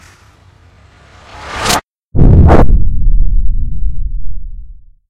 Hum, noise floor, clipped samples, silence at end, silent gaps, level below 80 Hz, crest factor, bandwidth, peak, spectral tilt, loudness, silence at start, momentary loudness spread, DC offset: none; -43 dBFS; 0.2%; 0.4 s; 1.84-2.11 s; -14 dBFS; 8 dB; 15 kHz; 0 dBFS; -6 dB/octave; -13 LUFS; 1.35 s; 22 LU; under 0.1%